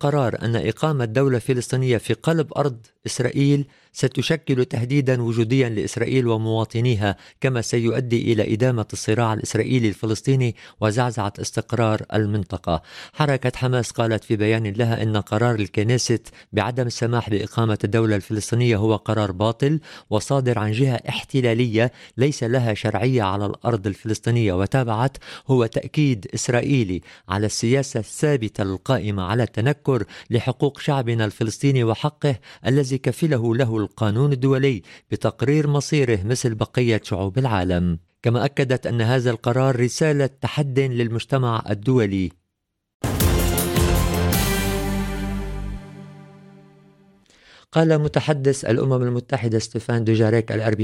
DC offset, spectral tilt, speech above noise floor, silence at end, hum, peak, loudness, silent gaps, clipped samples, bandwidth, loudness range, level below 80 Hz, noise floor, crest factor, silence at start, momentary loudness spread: under 0.1%; -6 dB/octave; 57 dB; 0 s; none; -4 dBFS; -21 LUFS; 42.94-43.00 s; under 0.1%; 16.5 kHz; 2 LU; -38 dBFS; -78 dBFS; 16 dB; 0 s; 6 LU